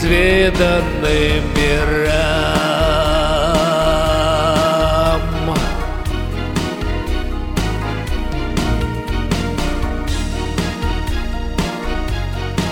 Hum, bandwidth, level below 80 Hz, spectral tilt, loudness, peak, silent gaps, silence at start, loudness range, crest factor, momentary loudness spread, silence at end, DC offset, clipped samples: none; 17 kHz; -22 dBFS; -5.5 dB/octave; -17 LUFS; 0 dBFS; none; 0 s; 6 LU; 16 dB; 8 LU; 0 s; under 0.1%; under 0.1%